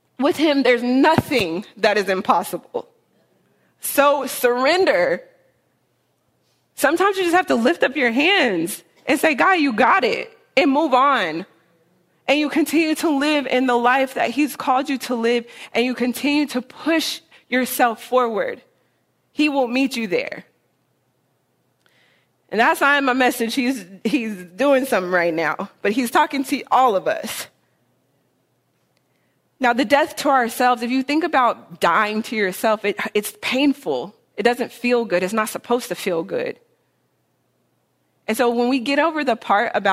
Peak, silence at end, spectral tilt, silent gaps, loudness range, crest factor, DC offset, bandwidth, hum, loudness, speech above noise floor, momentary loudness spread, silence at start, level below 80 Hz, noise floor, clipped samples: 0 dBFS; 0 s; -3.5 dB/octave; none; 6 LU; 20 dB; under 0.1%; 16 kHz; none; -19 LUFS; 48 dB; 10 LU; 0.2 s; -64 dBFS; -67 dBFS; under 0.1%